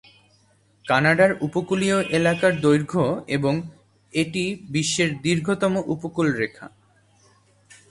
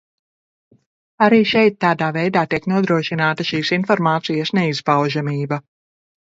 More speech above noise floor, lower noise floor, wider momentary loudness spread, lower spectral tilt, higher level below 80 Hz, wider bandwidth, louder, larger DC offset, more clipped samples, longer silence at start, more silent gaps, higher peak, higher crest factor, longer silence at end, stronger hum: second, 38 dB vs over 73 dB; second, -60 dBFS vs under -90 dBFS; about the same, 9 LU vs 7 LU; second, -5 dB/octave vs -6.5 dB/octave; about the same, -58 dBFS vs -60 dBFS; first, 11.5 kHz vs 7.8 kHz; second, -22 LUFS vs -18 LUFS; neither; neither; second, 0.85 s vs 1.2 s; neither; second, -4 dBFS vs 0 dBFS; about the same, 20 dB vs 18 dB; first, 1.25 s vs 0.7 s; neither